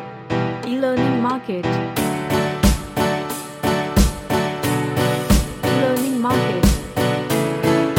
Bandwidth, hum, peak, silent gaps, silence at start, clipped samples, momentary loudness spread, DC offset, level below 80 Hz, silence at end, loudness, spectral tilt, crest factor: 17 kHz; none; -2 dBFS; none; 0 s; under 0.1%; 5 LU; under 0.1%; -28 dBFS; 0 s; -20 LUFS; -5.5 dB/octave; 18 dB